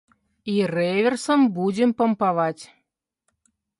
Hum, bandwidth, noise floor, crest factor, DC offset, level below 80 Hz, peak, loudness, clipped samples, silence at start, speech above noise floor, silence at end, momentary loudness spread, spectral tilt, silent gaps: none; 11.5 kHz; -75 dBFS; 14 dB; under 0.1%; -70 dBFS; -8 dBFS; -22 LUFS; under 0.1%; 0.45 s; 54 dB; 1.15 s; 7 LU; -6 dB/octave; none